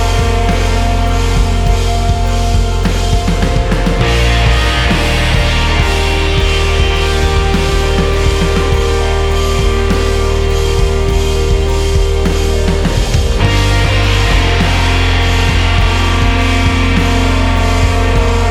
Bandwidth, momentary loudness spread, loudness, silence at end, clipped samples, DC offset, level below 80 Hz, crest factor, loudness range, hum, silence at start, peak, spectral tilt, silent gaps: 14.5 kHz; 2 LU; -13 LUFS; 0 s; under 0.1%; under 0.1%; -14 dBFS; 10 dB; 2 LU; none; 0 s; 0 dBFS; -5 dB/octave; none